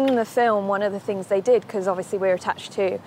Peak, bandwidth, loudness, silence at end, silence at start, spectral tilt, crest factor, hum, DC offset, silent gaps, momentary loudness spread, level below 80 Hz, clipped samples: -8 dBFS; 16 kHz; -23 LUFS; 0.05 s; 0 s; -5.5 dB/octave; 14 dB; none; under 0.1%; none; 6 LU; -76 dBFS; under 0.1%